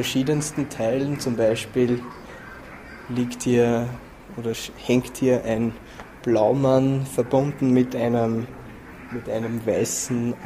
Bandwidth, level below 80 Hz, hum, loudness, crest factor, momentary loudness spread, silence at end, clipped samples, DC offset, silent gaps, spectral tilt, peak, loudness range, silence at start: 15.5 kHz; -50 dBFS; none; -23 LUFS; 18 dB; 20 LU; 0 s; under 0.1%; under 0.1%; none; -5.5 dB/octave; -6 dBFS; 4 LU; 0 s